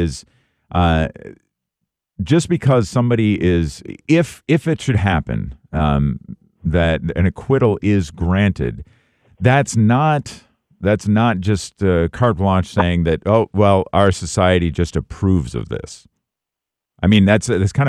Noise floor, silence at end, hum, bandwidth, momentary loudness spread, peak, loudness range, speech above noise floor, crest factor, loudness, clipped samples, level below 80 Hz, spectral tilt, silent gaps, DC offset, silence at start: -84 dBFS; 0 s; none; 11.5 kHz; 11 LU; 0 dBFS; 3 LU; 68 dB; 16 dB; -17 LUFS; under 0.1%; -34 dBFS; -6.5 dB/octave; none; under 0.1%; 0 s